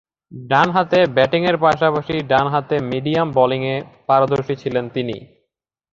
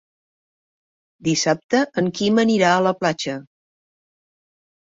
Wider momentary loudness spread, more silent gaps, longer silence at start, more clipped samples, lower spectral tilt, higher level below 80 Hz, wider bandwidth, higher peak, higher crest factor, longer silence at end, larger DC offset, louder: about the same, 9 LU vs 11 LU; second, none vs 1.64-1.69 s; second, 0.3 s vs 1.25 s; neither; first, -7 dB/octave vs -4.5 dB/octave; first, -54 dBFS vs -64 dBFS; about the same, 7.4 kHz vs 7.8 kHz; about the same, -2 dBFS vs -4 dBFS; about the same, 16 dB vs 18 dB; second, 0.7 s vs 1.45 s; neither; about the same, -18 LUFS vs -19 LUFS